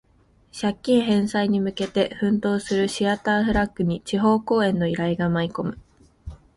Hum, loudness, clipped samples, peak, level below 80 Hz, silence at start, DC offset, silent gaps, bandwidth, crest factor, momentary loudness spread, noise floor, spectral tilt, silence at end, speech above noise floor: none; -23 LUFS; under 0.1%; -6 dBFS; -46 dBFS; 0.55 s; under 0.1%; none; 11.5 kHz; 16 dB; 7 LU; -59 dBFS; -6 dB/octave; 0.2 s; 37 dB